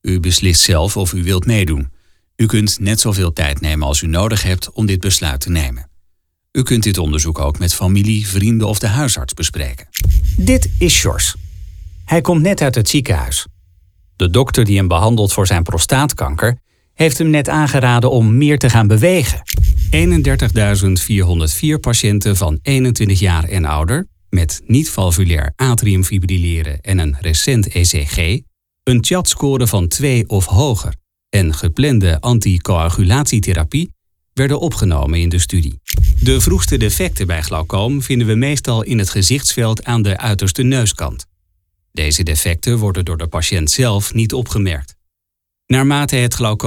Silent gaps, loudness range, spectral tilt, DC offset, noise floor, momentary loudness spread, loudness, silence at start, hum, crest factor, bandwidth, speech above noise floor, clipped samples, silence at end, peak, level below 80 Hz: none; 4 LU; -4.5 dB/octave; under 0.1%; -78 dBFS; 7 LU; -14 LUFS; 0.05 s; none; 14 dB; 18 kHz; 65 dB; under 0.1%; 0 s; 0 dBFS; -24 dBFS